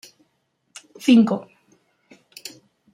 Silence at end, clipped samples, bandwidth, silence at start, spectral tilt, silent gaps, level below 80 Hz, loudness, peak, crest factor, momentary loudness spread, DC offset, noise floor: 1.5 s; under 0.1%; 15.5 kHz; 1.05 s; -5.5 dB/octave; none; -72 dBFS; -18 LUFS; -4 dBFS; 20 dB; 23 LU; under 0.1%; -70 dBFS